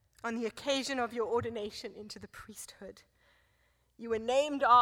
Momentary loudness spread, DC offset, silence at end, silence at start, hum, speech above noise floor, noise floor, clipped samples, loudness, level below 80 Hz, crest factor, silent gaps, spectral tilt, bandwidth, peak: 17 LU; under 0.1%; 0 s; 0.25 s; none; 40 dB; -72 dBFS; under 0.1%; -33 LUFS; -66 dBFS; 22 dB; none; -3.5 dB/octave; 17 kHz; -12 dBFS